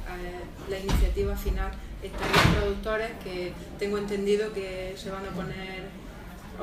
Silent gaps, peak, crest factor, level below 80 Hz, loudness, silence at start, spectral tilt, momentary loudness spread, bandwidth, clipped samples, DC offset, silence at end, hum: none; -6 dBFS; 22 dB; -34 dBFS; -29 LUFS; 0 s; -5 dB/octave; 16 LU; 16 kHz; under 0.1%; under 0.1%; 0 s; none